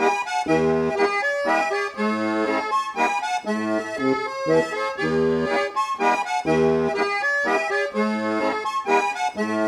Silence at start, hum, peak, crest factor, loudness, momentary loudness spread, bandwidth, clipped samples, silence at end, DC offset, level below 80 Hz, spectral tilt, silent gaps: 0 s; none; -8 dBFS; 14 dB; -22 LUFS; 4 LU; 13 kHz; under 0.1%; 0 s; under 0.1%; -56 dBFS; -5 dB/octave; none